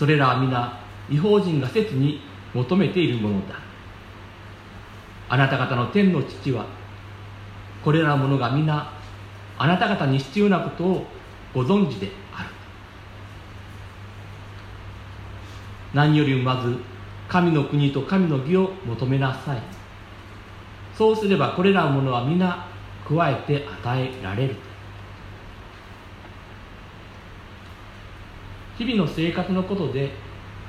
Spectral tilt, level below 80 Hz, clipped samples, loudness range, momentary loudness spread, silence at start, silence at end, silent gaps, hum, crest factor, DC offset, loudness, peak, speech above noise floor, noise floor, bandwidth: -8 dB/octave; -48 dBFS; under 0.1%; 12 LU; 22 LU; 0 s; 0 s; none; none; 20 dB; under 0.1%; -22 LUFS; -4 dBFS; 21 dB; -42 dBFS; 10 kHz